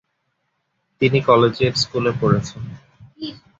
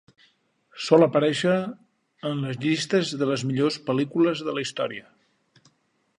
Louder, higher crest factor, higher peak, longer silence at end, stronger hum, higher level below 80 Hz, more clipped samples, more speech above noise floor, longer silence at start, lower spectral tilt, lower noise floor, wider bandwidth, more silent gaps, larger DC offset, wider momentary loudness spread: first, -18 LUFS vs -24 LUFS; about the same, 20 dB vs 20 dB; about the same, -2 dBFS vs -4 dBFS; second, 0.25 s vs 1.2 s; neither; first, -48 dBFS vs -70 dBFS; neither; first, 54 dB vs 44 dB; first, 1 s vs 0.75 s; about the same, -6 dB/octave vs -5.5 dB/octave; first, -72 dBFS vs -67 dBFS; second, 8 kHz vs 11 kHz; neither; neither; first, 18 LU vs 12 LU